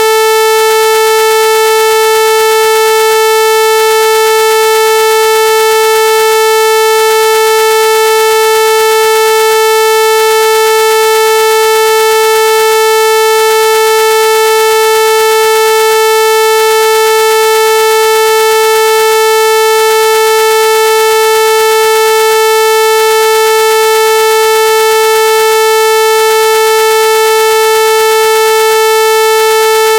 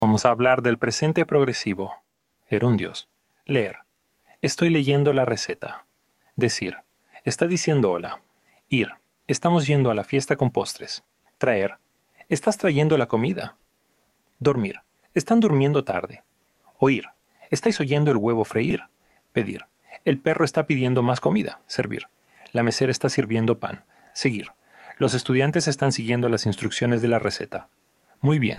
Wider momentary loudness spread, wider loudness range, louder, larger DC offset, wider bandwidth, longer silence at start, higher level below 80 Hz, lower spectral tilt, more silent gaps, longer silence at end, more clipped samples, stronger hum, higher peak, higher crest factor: second, 0 LU vs 13 LU; about the same, 0 LU vs 2 LU; first, -7 LUFS vs -23 LUFS; neither; first, 17.5 kHz vs 12.5 kHz; about the same, 0 s vs 0 s; first, -54 dBFS vs -60 dBFS; second, 1 dB/octave vs -5.5 dB/octave; neither; about the same, 0 s vs 0 s; first, 0.3% vs under 0.1%; first, 60 Hz at -55 dBFS vs none; about the same, 0 dBFS vs -2 dBFS; second, 6 dB vs 22 dB